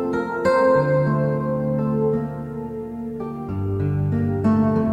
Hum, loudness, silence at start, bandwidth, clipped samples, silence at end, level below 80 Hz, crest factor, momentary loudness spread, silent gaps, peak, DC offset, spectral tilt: none; -22 LUFS; 0 s; 8.8 kHz; under 0.1%; 0 s; -46 dBFS; 14 dB; 13 LU; none; -6 dBFS; under 0.1%; -9.5 dB/octave